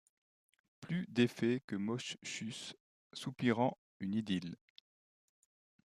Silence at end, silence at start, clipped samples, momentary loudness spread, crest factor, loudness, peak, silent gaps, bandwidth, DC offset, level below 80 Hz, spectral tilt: 1.35 s; 0.8 s; under 0.1%; 16 LU; 22 dB; -38 LUFS; -18 dBFS; 1.64-1.68 s, 2.80-3.10 s, 3.78-4.00 s; 12.5 kHz; under 0.1%; -80 dBFS; -5.5 dB/octave